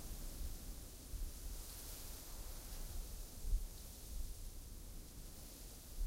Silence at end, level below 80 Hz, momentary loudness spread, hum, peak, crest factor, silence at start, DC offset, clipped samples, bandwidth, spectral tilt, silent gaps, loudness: 0 s; -48 dBFS; 8 LU; none; -26 dBFS; 20 dB; 0 s; under 0.1%; under 0.1%; 16 kHz; -3.5 dB/octave; none; -51 LUFS